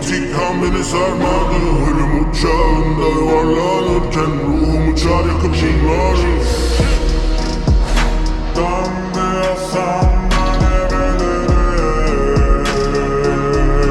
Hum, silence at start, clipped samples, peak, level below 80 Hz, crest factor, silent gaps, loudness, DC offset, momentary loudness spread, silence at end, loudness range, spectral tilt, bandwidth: none; 0 s; under 0.1%; -2 dBFS; -18 dBFS; 12 dB; none; -16 LUFS; under 0.1%; 4 LU; 0 s; 2 LU; -6 dB/octave; 12 kHz